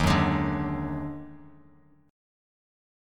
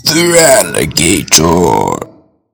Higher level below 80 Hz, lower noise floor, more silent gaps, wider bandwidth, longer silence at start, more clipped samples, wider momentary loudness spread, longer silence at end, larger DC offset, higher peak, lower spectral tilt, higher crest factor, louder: second, -42 dBFS vs -36 dBFS; first, -58 dBFS vs -39 dBFS; neither; second, 16 kHz vs over 20 kHz; about the same, 0 s vs 0.05 s; second, under 0.1% vs 3%; first, 18 LU vs 8 LU; first, 1.6 s vs 0.45 s; neither; second, -8 dBFS vs 0 dBFS; first, -6.5 dB/octave vs -3 dB/octave; first, 22 dB vs 10 dB; second, -28 LUFS vs -8 LUFS